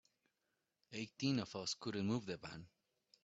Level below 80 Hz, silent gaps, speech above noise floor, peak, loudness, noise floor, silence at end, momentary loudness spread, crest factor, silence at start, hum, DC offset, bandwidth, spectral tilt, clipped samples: -78 dBFS; none; 45 dB; -24 dBFS; -43 LUFS; -87 dBFS; 0.6 s; 13 LU; 20 dB; 0.9 s; none; under 0.1%; 8 kHz; -5 dB/octave; under 0.1%